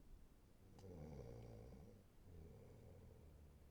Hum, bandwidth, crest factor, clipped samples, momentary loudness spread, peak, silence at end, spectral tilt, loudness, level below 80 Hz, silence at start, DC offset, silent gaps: none; over 20 kHz; 18 dB; under 0.1%; 11 LU; -44 dBFS; 0 s; -7.5 dB/octave; -62 LUFS; -66 dBFS; 0 s; under 0.1%; none